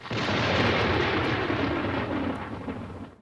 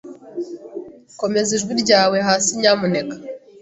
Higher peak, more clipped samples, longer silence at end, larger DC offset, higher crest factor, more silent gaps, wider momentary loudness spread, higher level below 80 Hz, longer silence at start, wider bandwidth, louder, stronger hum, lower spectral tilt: second, -12 dBFS vs -2 dBFS; neither; second, 0.05 s vs 0.25 s; neither; about the same, 16 dB vs 18 dB; neither; second, 13 LU vs 19 LU; first, -46 dBFS vs -60 dBFS; about the same, 0 s vs 0.05 s; first, 11 kHz vs 8.2 kHz; second, -26 LUFS vs -17 LUFS; neither; first, -6 dB/octave vs -3 dB/octave